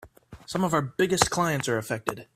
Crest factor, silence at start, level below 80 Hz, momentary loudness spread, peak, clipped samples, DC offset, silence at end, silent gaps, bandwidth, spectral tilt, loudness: 24 dB; 0 s; -54 dBFS; 8 LU; -2 dBFS; under 0.1%; under 0.1%; 0.1 s; none; 16 kHz; -4 dB/octave; -26 LUFS